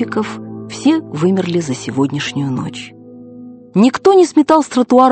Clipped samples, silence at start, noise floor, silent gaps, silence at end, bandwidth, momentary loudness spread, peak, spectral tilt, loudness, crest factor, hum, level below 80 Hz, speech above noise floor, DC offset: 0.2%; 0 s; -35 dBFS; none; 0 s; 8.8 kHz; 18 LU; 0 dBFS; -6 dB/octave; -14 LUFS; 14 dB; none; -56 dBFS; 22 dB; under 0.1%